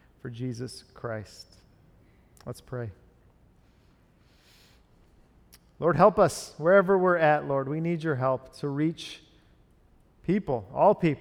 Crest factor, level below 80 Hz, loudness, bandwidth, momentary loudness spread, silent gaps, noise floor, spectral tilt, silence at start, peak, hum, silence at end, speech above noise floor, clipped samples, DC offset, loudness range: 22 dB; -58 dBFS; -26 LUFS; 15.5 kHz; 20 LU; none; -61 dBFS; -6.5 dB/octave; 0.25 s; -6 dBFS; none; 0 s; 35 dB; under 0.1%; under 0.1%; 21 LU